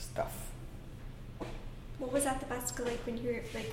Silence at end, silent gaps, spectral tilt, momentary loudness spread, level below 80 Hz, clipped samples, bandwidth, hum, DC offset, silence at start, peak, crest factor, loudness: 0 s; none; -4 dB/octave; 16 LU; -48 dBFS; under 0.1%; 16.5 kHz; none; under 0.1%; 0 s; -20 dBFS; 18 dB; -38 LUFS